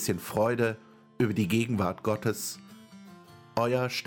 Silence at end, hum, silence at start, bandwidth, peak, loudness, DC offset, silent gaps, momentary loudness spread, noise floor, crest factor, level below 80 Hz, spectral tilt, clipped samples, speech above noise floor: 0 s; none; 0 s; 17.5 kHz; -12 dBFS; -29 LUFS; under 0.1%; none; 17 LU; -51 dBFS; 18 dB; -62 dBFS; -5.5 dB/octave; under 0.1%; 23 dB